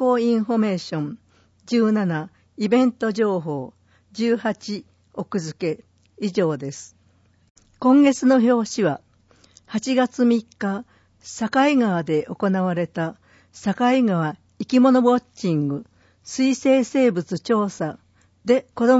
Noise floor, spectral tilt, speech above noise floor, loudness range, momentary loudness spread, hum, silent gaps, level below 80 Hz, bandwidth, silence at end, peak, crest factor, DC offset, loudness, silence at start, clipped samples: -59 dBFS; -6 dB/octave; 39 dB; 6 LU; 15 LU; none; 7.50-7.55 s; -66 dBFS; 8 kHz; 0 s; -6 dBFS; 16 dB; under 0.1%; -21 LUFS; 0 s; under 0.1%